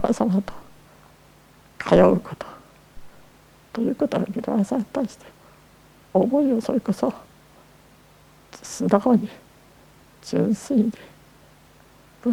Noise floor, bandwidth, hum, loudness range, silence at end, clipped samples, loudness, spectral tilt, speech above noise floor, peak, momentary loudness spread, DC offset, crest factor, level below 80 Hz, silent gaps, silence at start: -52 dBFS; 17.5 kHz; none; 4 LU; 0 s; under 0.1%; -22 LUFS; -7 dB/octave; 31 dB; 0 dBFS; 18 LU; under 0.1%; 24 dB; -52 dBFS; none; 0 s